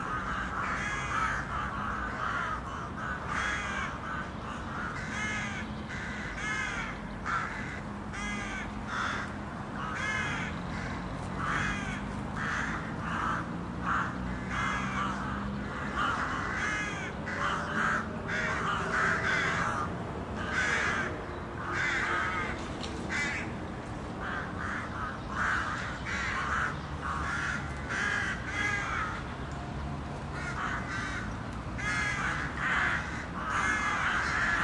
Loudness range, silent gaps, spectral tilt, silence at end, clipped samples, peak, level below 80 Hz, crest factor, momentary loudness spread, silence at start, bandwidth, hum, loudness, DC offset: 4 LU; none; -4.5 dB/octave; 0 s; under 0.1%; -16 dBFS; -46 dBFS; 18 dB; 9 LU; 0 s; 11.5 kHz; none; -32 LUFS; under 0.1%